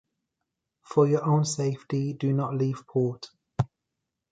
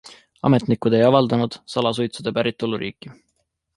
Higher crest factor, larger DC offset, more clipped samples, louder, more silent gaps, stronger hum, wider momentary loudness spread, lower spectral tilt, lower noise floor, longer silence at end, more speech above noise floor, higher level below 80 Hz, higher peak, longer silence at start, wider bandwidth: about the same, 20 dB vs 20 dB; neither; neither; second, -27 LUFS vs -20 LUFS; neither; neither; about the same, 9 LU vs 10 LU; about the same, -7 dB/octave vs -7 dB/octave; first, -84 dBFS vs -72 dBFS; about the same, 0.65 s vs 0.65 s; first, 59 dB vs 52 dB; about the same, -60 dBFS vs -58 dBFS; second, -8 dBFS vs -2 dBFS; first, 0.9 s vs 0.05 s; second, 9.2 kHz vs 11.5 kHz